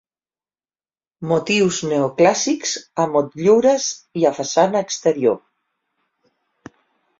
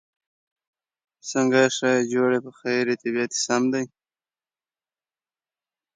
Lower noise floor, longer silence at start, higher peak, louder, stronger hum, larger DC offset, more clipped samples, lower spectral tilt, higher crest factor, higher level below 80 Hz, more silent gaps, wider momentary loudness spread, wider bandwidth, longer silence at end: about the same, under -90 dBFS vs under -90 dBFS; about the same, 1.2 s vs 1.25 s; about the same, -2 dBFS vs -4 dBFS; first, -18 LUFS vs -23 LUFS; neither; neither; neither; about the same, -4 dB/octave vs -3.5 dB/octave; about the same, 18 dB vs 22 dB; first, -62 dBFS vs -76 dBFS; neither; second, 7 LU vs 10 LU; second, 7.8 kHz vs 9.4 kHz; second, 1.85 s vs 2.1 s